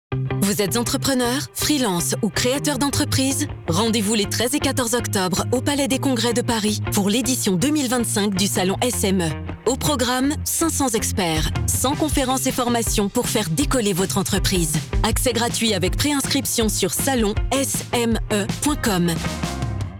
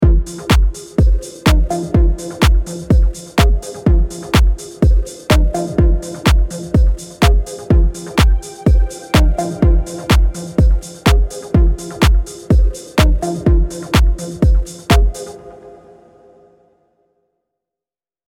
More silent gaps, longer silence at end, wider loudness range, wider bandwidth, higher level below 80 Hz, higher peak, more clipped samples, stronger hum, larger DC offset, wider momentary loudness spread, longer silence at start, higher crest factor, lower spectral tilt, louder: neither; second, 0 s vs 2.6 s; about the same, 1 LU vs 3 LU; first, over 20 kHz vs 16 kHz; second, -34 dBFS vs -16 dBFS; second, -10 dBFS vs 0 dBFS; neither; neither; neither; about the same, 2 LU vs 4 LU; about the same, 0.1 s vs 0 s; about the same, 10 dB vs 14 dB; second, -4 dB/octave vs -6 dB/octave; second, -20 LUFS vs -16 LUFS